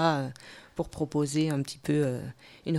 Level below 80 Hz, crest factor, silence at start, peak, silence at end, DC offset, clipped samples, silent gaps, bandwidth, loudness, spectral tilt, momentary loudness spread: -58 dBFS; 20 dB; 0 s; -10 dBFS; 0 s; under 0.1%; under 0.1%; none; 14 kHz; -30 LUFS; -6 dB/octave; 13 LU